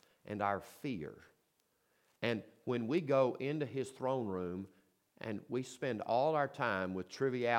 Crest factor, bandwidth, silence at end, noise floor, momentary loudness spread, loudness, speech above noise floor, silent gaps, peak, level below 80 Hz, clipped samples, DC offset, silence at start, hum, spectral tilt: 22 dB; 16.5 kHz; 0 s; -78 dBFS; 12 LU; -37 LUFS; 42 dB; none; -16 dBFS; -78 dBFS; under 0.1%; under 0.1%; 0.25 s; none; -6.5 dB/octave